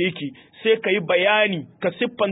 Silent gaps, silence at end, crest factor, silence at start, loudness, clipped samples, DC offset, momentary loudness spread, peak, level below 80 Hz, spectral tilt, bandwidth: none; 0 s; 16 dB; 0 s; -21 LUFS; under 0.1%; under 0.1%; 10 LU; -6 dBFS; -66 dBFS; -10 dB/octave; 4 kHz